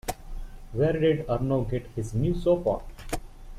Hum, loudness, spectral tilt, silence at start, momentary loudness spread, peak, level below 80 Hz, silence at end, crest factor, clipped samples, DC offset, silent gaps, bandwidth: none; -28 LUFS; -7 dB/octave; 0.05 s; 13 LU; -12 dBFS; -38 dBFS; 0 s; 16 dB; under 0.1%; under 0.1%; none; 15.5 kHz